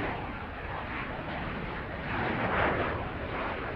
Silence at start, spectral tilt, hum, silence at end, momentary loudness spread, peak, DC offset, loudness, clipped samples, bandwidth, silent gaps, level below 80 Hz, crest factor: 0 s; -8 dB/octave; none; 0 s; 9 LU; -14 dBFS; under 0.1%; -33 LUFS; under 0.1%; 6.6 kHz; none; -44 dBFS; 20 dB